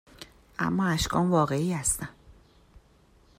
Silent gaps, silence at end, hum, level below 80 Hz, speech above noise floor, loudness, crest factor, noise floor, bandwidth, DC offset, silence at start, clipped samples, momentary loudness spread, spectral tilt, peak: none; 1.05 s; none; -48 dBFS; 34 dB; -26 LUFS; 18 dB; -60 dBFS; 16 kHz; under 0.1%; 0.2 s; under 0.1%; 18 LU; -4.5 dB/octave; -10 dBFS